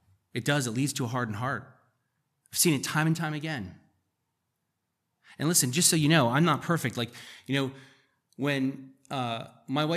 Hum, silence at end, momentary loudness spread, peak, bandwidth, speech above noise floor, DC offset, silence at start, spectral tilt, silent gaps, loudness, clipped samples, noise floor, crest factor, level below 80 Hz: none; 0 s; 15 LU; -8 dBFS; 15 kHz; 53 dB; under 0.1%; 0.35 s; -4 dB/octave; none; -27 LUFS; under 0.1%; -81 dBFS; 22 dB; -74 dBFS